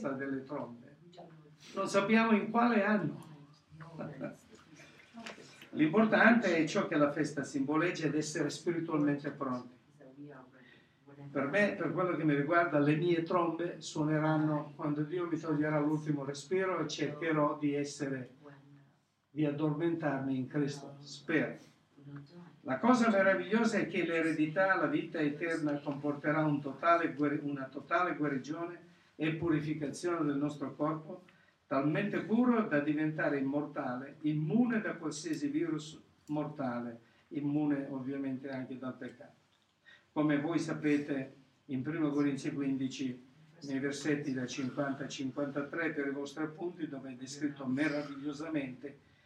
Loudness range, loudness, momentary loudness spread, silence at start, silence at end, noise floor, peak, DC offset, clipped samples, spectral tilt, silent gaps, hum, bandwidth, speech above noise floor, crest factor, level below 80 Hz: 7 LU; -33 LUFS; 15 LU; 0 s; 0.3 s; -71 dBFS; -10 dBFS; under 0.1%; under 0.1%; -6 dB/octave; none; none; 10 kHz; 37 dB; 24 dB; -80 dBFS